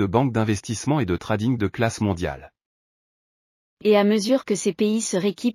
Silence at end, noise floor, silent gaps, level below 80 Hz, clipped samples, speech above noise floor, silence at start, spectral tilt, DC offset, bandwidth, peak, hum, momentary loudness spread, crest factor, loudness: 0 s; under -90 dBFS; 2.66-3.77 s; -50 dBFS; under 0.1%; over 68 dB; 0 s; -5.5 dB/octave; under 0.1%; 14 kHz; -6 dBFS; none; 7 LU; 18 dB; -22 LUFS